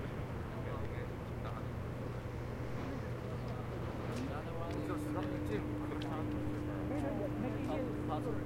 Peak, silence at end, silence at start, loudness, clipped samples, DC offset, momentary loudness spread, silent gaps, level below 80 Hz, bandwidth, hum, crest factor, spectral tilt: -24 dBFS; 0 s; 0 s; -40 LUFS; under 0.1%; under 0.1%; 4 LU; none; -52 dBFS; 16.5 kHz; none; 16 dB; -7.5 dB/octave